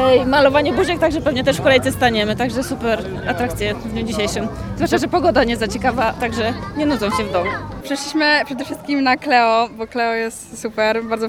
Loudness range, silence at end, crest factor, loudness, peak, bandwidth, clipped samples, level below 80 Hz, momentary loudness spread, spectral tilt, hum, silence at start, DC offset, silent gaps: 3 LU; 0 s; 16 dB; -18 LUFS; -2 dBFS; 17.5 kHz; under 0.1%; -38 dBFS; 10 LU; -4.5 dB/octave; none; 0 s; 0.1%; none